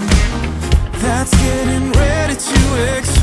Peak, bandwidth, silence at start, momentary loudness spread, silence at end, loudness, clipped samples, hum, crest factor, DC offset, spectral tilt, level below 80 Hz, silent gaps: 0 dBFS; 12 kHz; 0 s; 4 LU; 0 s; -15 LUFS; under 0.1%; none; 14 dB; under 0.1%; -5 dB/octave; -18 dBFS; none